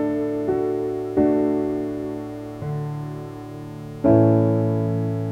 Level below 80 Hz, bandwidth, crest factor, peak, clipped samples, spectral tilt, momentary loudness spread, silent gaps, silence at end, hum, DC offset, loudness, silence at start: -50 dBFS; 8.8 kHz; 16 dB; -4 dBFS; under 0.1%; -10 dB/octave; 17 LU; none; 0 s; none; under 0.1%; -22 LUFS; 0 s